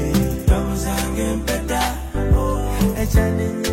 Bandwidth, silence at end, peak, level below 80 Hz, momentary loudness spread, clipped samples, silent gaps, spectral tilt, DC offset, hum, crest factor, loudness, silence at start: 16.5 kHz; 0 s; -6 dBFS; -22 dBFS; 4 LU; under 0.1%; none; -5.5 dB/octave; under 0.1%; none; 14 dB; -20 LUFS; 0 s